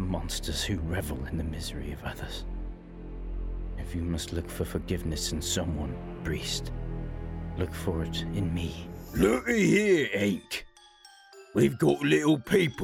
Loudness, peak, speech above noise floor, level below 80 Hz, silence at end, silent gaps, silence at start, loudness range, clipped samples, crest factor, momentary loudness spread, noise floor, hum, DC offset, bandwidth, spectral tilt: -30 LUFS; -10 dBFS; 26 dB; -40 dBFS; 0 s; none; 0 s; 10 LU; under 0.1%; 18 dB; 14 LU; -55 dBFS; none; under 0.1%; 16 kHz; -5 dB/octave